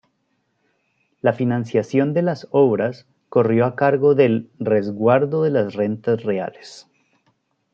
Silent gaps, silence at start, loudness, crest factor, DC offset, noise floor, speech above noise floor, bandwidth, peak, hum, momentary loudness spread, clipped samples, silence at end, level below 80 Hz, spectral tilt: none; 1.25 s; -19 LUFS; 16 dB; under 0.1%; -69 dBFS; 51 dB; 7.6 kHz; -4 dBFS; none; 7 LU; under 0.1%; 0.95 s; -68 dBFS; -8.5 dB/octave